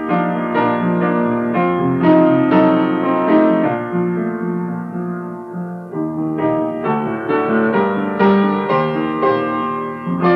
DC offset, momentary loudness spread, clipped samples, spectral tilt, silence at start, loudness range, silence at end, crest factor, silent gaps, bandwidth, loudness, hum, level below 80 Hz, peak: under 0.1%; 11 LU; under 0.1%; -9.5 dB/octave; 0 s; 6 LU; 0 s; 14 dB; none; 5.6 kHz; -17 LUFS; none; -56 dBFS; -2 dBFS